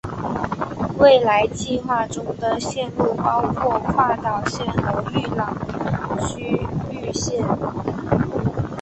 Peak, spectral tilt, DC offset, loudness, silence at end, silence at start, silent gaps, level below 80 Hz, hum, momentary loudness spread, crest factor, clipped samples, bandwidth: -2 dBFS; -5.5 dB/octave; under 0.1%; -21 LUFS; 0 s; 0.05 s; none; -42 dBFS; none; 10 LU; 18 dB; under 0.1%; 8.6 kHz